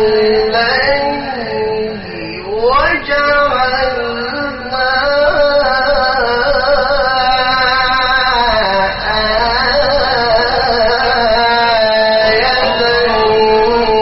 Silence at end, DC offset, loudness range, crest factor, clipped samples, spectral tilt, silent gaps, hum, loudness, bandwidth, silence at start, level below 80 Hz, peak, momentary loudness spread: 0 s; 0.1%; 3 LU; 12 dB; under 0.1%; -0.5 dB/octave; none; none; -12 LUFS; 6 kHz; 0 s; -30 dBFS; 0 dBFS; 7 LU